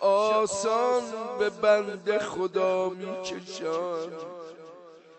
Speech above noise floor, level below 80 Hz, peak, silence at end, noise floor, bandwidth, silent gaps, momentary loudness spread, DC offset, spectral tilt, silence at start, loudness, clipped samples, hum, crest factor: 21 dB; -72 dBFS; -10 dBFS; 0.2 s; -49 dBFS; 8.6 kHz; none; 17 LU; under 0.1%; -3.5 dB/octave; 0 s; -27 LUFS; under 0.1%; none; 18 dB